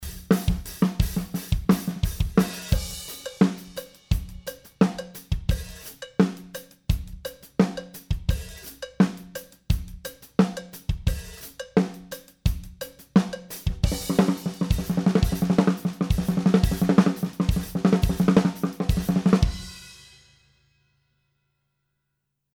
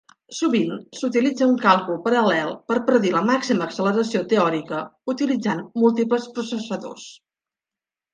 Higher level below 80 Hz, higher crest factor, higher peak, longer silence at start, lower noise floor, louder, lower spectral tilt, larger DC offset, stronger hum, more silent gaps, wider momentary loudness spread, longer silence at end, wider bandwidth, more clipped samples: first, -34 dBFS vs -72 dBFS; about the same, 22 dB vs 18 dB; about the same, -4 dBFS vs -2 dBFS; second, 0 s vs 0.3 s; second, -79 dBFS vs under -90 dBFS; second, -25 LUFS vs -21 LUFS; about the same, -6.5 dB/octave vs -5.5 dB/octave; neither; neither; neither; first, 17 LU vs 10 LU; first, 2.6 s vs 1 s; first, over 20 kHz vs 9.6 kHz; neither